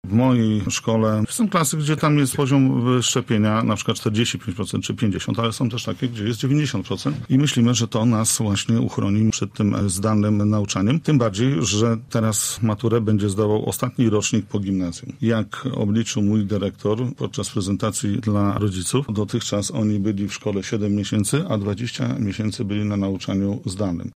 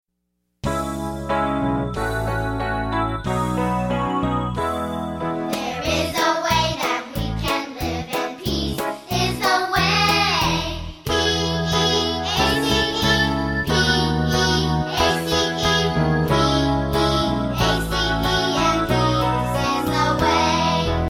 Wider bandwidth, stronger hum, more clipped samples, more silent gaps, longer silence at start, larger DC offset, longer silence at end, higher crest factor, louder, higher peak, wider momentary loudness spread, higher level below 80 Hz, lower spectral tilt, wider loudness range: second, 15 kHz vs 17 kHz; neither; neither; neither; second, 0.05 s vs 0.65 s; neither; about the same, 0.05 s vs 0 s; about the same, 14 dB vs 16 dB; about the same, -21 LUFS vs -20 LUFS; about the same, -6 dBFS vs -4 dBFS; about the same, 6 LU vs 7 LU; second, -52 dBFS vs -34 dBFS; about the same, -5.5 dB/octave vs -4.5 dB/octave; about the same, 4 LU vs 4 LU